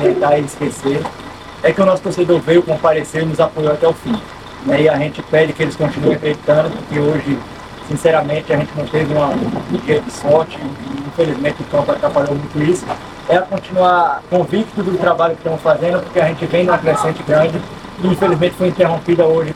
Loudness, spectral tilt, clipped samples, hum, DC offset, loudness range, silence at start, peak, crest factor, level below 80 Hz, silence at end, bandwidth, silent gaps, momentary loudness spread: -15 LUFS; -6.5 dB/octave; under 0.1%; none; under 0.1%; 2 LU; 0 s; 0 dBFS; 14 dB; -44 dBFS; 0 s; 14.5 kHz; none; 9 LU